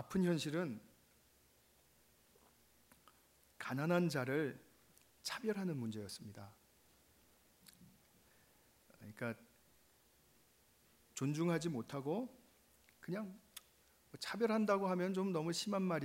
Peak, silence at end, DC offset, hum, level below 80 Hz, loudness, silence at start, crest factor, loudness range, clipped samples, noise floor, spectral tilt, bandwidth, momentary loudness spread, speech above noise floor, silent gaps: -20 dBFS; 0 s; under 0.1%; none; -78 dBFS; -40 LUFS; 0 s; 22 dB; 14 LU; under 0.1%; -71 dBFS; -5.5 dB/octave; 16 kHz; 21 LU; 32 dB; none